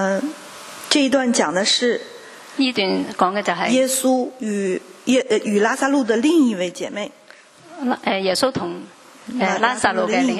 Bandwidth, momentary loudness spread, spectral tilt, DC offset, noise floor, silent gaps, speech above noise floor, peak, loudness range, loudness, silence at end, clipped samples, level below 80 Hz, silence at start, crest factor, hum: 13.5 kHz; 14 LU; -3.5 dB/octave; under 0.1%; -46 dBFS; none; 27 dB; 0 dBFS; 3 LU; -19 LUFS; 0 s; under 0.1%; -64 dBFS; 0 s; 20 dB; none